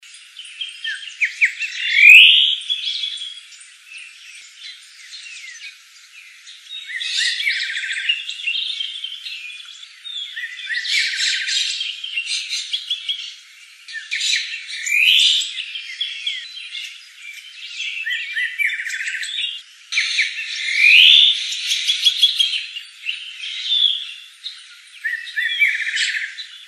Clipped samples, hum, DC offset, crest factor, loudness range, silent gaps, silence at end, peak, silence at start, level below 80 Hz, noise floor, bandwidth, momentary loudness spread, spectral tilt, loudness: under 0.1%; none; under 0.1%; 20 dB; 13 LU; none; 0 s; 0 dBFS; 0.05 s; under -90 dBFS; -44 dBFS; 13 kHz; 22 LU; 10.5 dB/octave; -16 LUFS